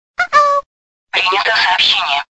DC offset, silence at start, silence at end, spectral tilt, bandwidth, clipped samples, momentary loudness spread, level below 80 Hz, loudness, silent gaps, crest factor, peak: under 0.1%; 0.2 s; 0.15 s; 0 dB/octave; 8.4 kHz; under 0.1%; 6 LU; -56 dBFS; -12 LUFS; 0.66-1.07 s; 14 dB; 0 dBFS